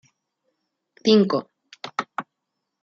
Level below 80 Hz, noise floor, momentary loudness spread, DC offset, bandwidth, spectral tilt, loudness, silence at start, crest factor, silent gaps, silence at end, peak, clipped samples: -74 dBFS; -80 dBFS; 17 LU; under 0.1%; 7.4 kHz; -6 dB/octave; -22 LUFS; 1.05 s; 20 dB; none; 0.6 s; -6 dBFS; under 0.1%